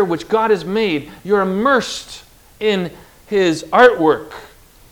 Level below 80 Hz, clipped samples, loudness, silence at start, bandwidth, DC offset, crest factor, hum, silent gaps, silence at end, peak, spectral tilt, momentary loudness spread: -50 dBFS; 0.1%; -16 LUFS; 0 s; 19.5 kHz; under 0.1%; 16 dB; none; none; 0.45 s; 0 dBFS; -5 dB/octave; 17 LU